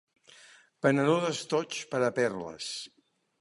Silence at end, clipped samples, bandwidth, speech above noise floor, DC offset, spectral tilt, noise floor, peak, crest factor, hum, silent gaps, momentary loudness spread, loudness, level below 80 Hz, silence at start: 0.55 s; under 0.1%; 11.5 kHz; 28 dB; under 0.1%; -5 dB/octave; -57 dBFS; -10 dBFS; 22 dB; none; none; 11 LU; -30 LUFS; -74 dBFS; 0.85 s